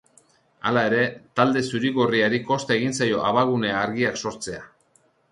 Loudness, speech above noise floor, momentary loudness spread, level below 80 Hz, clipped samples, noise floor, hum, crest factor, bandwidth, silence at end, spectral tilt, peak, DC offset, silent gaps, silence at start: -22 LUFS; 40 dB; 9 LU; -60 dBFS; under 0.1%; -63 dBFS; none; 18 dB; 11.5 kHz; 0.65 s; -5 dB/octave; -4 dBFS; under 0.1%; none; 0.65 s